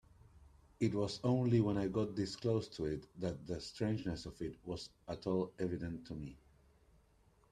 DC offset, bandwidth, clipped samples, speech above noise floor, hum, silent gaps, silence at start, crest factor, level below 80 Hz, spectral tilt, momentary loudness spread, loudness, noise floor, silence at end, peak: under 0.1%; 10.5 kHz; under 0.1%; 32 dB; none; none; 0.35 s; 18 dB; -62 dBFS; -7 dB/octave; 13 LU; -39 LUFS; -70 dBFS; 1.15 s; -20 dBFS